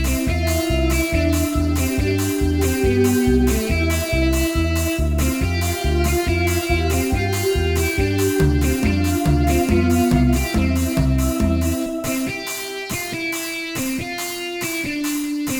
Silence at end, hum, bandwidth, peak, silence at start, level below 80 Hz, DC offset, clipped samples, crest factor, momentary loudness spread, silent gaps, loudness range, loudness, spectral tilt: 0 s; none; over 20 kHz; -4 dBFS; 0 s; -26 dBFS; under 0.1%; under 0.1%; 14 dB; 7 LU; none; 5 LU; -20 LUFS; -5.5 dB/octave